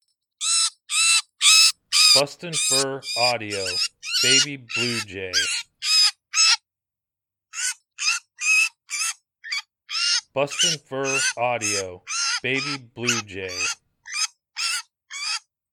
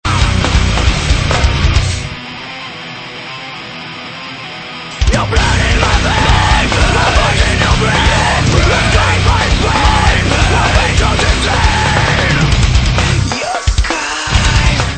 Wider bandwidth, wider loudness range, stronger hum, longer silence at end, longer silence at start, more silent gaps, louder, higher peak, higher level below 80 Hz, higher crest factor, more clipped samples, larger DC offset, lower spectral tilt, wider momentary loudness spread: first, 19 kHz vs 9.2 kHz; about the same, 8 LU vs 7 LU; neither; first, 0.35 s vs 0 s; first, 0.4 s vs 0.05 s; neither; second, -20 LUFS vs -11 LUFS; about the same, -2 dBFS vs 0 dBFS; second, -72 dBFS vs -16 dBFS; first, 20 dB vs 12 dB; neither; neither; second, 0 dB/octave vs -4 dB/octave; about the same, 13 LU vs 14 LU